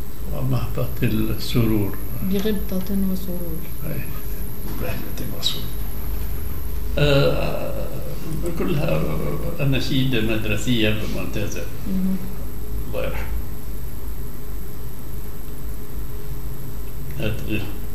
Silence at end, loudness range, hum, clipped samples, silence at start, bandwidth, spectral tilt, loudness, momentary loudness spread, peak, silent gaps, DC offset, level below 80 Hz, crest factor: 0 s; 9 LU; none; under 0.1%; 0 s; 16 kHz; -6 dB/octave; -26 LUFS; 13 LU; -4 dBFS; none; 10%; -32 dBFS; 20 dB